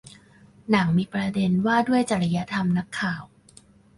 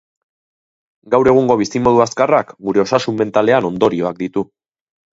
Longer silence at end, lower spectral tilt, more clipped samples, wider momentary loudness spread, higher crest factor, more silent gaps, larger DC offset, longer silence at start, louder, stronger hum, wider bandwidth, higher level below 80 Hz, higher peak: about the same, 0.7 s vs 0.7 s; about the same, -6.5 dB/octave vs -6 dB/octave; neither; about the same, 7 LU vs 9 LU; about the same, 18 dB vs 16 dB; neither; neither; second, 0.7 s vs 1.05 s; second, -23 LUFS vs -15 LUFS; neither; first, 11.5 kHz vs 7.8 kHz; second, -56 dBFS vs -50 dBFS; second, -6 dBFS vs 0 dBFS